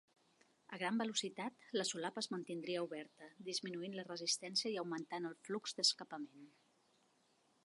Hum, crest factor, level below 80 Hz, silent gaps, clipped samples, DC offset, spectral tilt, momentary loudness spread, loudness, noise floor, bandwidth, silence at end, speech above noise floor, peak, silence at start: none; 22 dB; under -90 dBFS; none; under 0.1%; under 0.1%; -2.5 dB/octave; 15 LU; -41 LUFS; -76 dBFS; 11.5 kHz; 1.15 s; 33 dB; -22 dBFS; 0.7 s